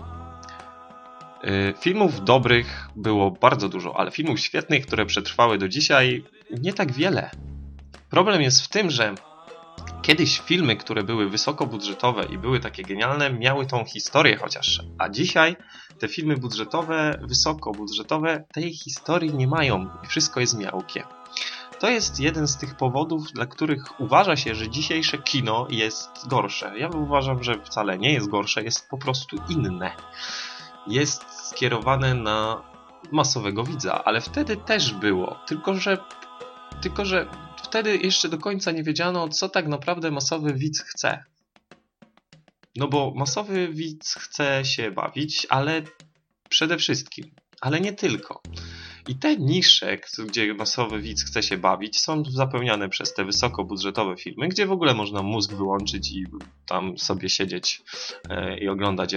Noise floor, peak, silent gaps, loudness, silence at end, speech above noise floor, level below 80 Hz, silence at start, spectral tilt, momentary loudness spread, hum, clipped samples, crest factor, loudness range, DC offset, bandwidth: -58 dBFS; 0 dBFS; none; -23 LUFS; 0 s; 34 dB; -48 dBFS; 0 s; -4 dB/octave; 14 LU; none; under 0.1%; 24 dB; 5 LU; under 0.1%; 9.4 kHz